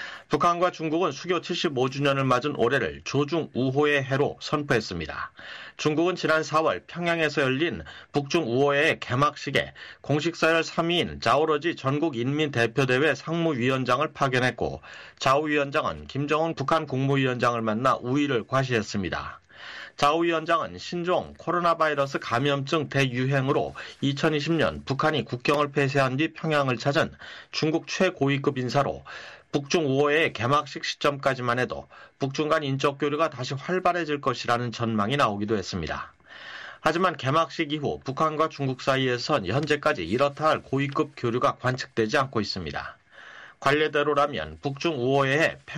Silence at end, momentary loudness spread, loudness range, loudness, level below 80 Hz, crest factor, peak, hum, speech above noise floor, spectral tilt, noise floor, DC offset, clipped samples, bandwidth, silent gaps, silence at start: 0 s; 9 LU; 2 LU; -25 LUFS; -56 dBFS; 16 dB; -10 dBFS; none; 22 dB; -5.5 dB/octave; -47 dBFS; under 0.1%; under 0.1%; 13 kHz; none; 0 s